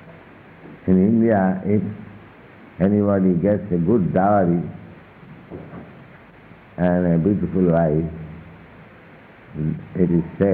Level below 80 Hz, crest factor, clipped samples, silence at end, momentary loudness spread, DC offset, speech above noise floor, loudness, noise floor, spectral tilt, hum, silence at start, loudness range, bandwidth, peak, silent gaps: -46 dBFS; 16 dB; under 0.1%; 0 s; 21 LU; under 0.1%; 27 dB; -19 LUFS; -45 dBFS; -13 dB/octave; none; 0.05 s; 3 LU; 3.7 kHz; -6 dBFS; none